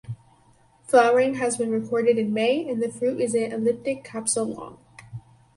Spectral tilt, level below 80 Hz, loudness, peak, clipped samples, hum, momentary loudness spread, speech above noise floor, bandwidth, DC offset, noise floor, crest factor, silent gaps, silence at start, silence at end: -4 dB/octave; -64 dBFS; -23 LUFS; -4 dBFS; under 0.1%; none; 22 LU; 35 dB; 11.5 kHz; under 0.1%; -58 dBFS; 20 dB; none; 0.05 s; 0.35 s